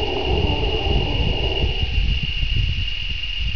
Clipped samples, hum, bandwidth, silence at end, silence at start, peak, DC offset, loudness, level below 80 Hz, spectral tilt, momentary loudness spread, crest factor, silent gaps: under 0.1%; none; 5.4 kHz; 0 s; 0 s; -8 dBFS; 3%; -22 LUFS; -24 dBFS; -6 dB/octave; 4 LU; 14 dB; none